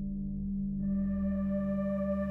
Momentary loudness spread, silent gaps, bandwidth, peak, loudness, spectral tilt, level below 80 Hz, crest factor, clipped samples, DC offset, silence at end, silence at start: 4 LU; none; 3 kHz; -22 dBFS; -33 LUFS; -12 dB/octave; -44 dBFS; 10 dB; under 0.1%; under 0.1%; 0 s; 0 s